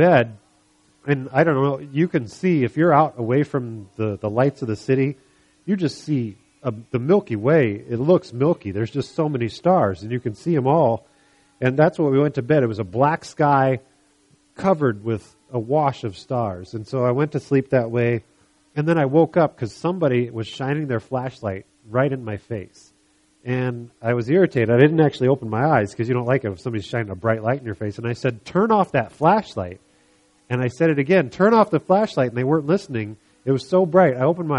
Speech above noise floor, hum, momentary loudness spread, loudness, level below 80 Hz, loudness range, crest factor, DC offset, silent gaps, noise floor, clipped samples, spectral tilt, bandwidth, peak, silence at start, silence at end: 41 dB; none; 12 LU; -21 LUFS; -58 dBFS; 5 LU; 20 dB; under 0.1%; none; -60 dBFS; under 0.1%; -8 dB/octave; 11 kHz; 0 dBFS; 0 s; 0 s